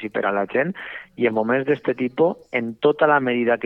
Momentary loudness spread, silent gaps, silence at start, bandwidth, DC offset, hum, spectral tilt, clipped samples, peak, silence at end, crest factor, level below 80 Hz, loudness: 8 LU; none; 0 s; 5.4 kHz; under 0.1%; none; -8.5 dB/octave; under 0.1%; -4 dBFS; 0 s; 16 dB; -66 dBFS; -21 LUFS